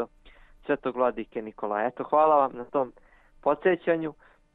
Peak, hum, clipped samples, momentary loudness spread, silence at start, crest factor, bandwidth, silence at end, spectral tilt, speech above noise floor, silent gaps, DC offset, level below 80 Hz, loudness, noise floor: -8 dBFS; none; under 0.1%; 14 LU; 0 s; 18 dB; 4 kHz; 0.45 s; -9 dB/octave; 28 dB; none; under 0.1%; -60 dBFS; -27 LUFS; -54 dBFS